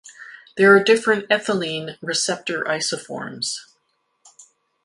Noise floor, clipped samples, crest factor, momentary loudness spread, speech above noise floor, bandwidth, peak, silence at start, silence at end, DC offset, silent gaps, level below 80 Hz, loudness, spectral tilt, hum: -70 dBFS; under 0.1%; 20 dB; 18 LU; 50 dB; 11.5 kHz; -2 dBFS; 0.05 s; 1.2 s; under 0.1%; none; -68 dBFS; -19 LUFS; -3 dB/octave; none